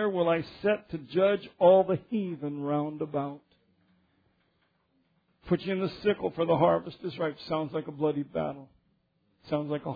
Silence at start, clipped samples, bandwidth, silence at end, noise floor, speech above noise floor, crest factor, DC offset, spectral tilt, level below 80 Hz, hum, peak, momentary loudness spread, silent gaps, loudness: 0 s; under 0.1%; 5 kHz; 0 s; -72 dBFS; 44 dB; 20 dB; under 0.1%; -5.5 dB/octave; -64 dBFS; none; -10 dBFS; 11 LU; none; -29 LUFS